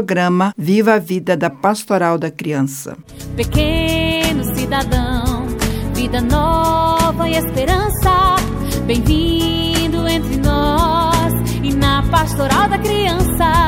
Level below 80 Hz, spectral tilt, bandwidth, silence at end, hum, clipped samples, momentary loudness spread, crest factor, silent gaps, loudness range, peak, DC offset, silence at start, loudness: -24 dBFS; -5.5 dB/octave; 17.5 kHz; 0 s; none; under 0.1%; 6 LU; 16 dB; none; 3 LU; 0 dBFS; under 0.1%; 0 s; -16 LUFS